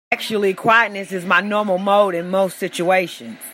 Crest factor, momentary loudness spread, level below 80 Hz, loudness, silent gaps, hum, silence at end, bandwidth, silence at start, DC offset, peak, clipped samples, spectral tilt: 16 dB; 8 LU; -70 dBFS; -18 LUFS; none; none; 0 s; 16 kHz; 0.1 s; under 0.1%; -2 dBFS; under 0.1%; -4.5 dB/octave